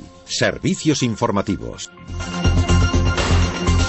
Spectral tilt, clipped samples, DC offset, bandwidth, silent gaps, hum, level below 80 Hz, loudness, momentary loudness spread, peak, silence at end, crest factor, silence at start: -5 dB/octave; under 0.1%; under 0.1%; 8.4 kHz; none; none; -26 dBFS; -19 LUFS; 12 LU; -4 dBFS; 0 s; 14 dB; 0 s